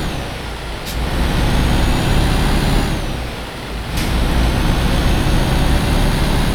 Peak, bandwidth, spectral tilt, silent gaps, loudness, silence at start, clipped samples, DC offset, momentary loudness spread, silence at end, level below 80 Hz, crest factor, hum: -2 dBFS; 17.5 kHz; -5.5 dB/octave; none; -18 LUFS; 0 s; under 0.1%; under 0.1%; 9 LU; 0 s; -18 dBFS; 12 dB; none